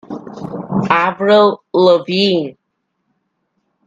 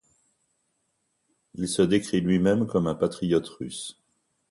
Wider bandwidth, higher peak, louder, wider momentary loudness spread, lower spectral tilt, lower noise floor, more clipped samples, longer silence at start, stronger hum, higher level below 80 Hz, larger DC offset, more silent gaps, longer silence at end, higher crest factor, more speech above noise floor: second, 9.2 kHz vs 11.5 kHz; first, 0 dBFS vs -8 dBFS; first, -13 LUFS vs -25 LUFS; first, 17 LU vs 14 LU; about the same, -6.5 dB/octave vs -6 dB/octave; second, -70 dBFS vs -75 dBFS; neither; second, 0.1 s vs 1.55 s; neither; about the same, -58 dBFS vs -56 dBFS; neither; neither; first, 1.35 s vs 0.6 s; about the same, 16 dB vs 18 dB; first, 57 dB vs 50 dB